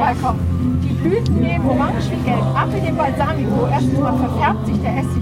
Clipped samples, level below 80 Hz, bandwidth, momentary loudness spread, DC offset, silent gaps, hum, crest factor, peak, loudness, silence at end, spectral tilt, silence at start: under 0.1%; -32 dBFS; 13.5 kHz; 2 LU; under 0.1%; none; none; 14 dB; -4 dBFS; -18 LUFS; 0 s; -8 dB/octave; 0 s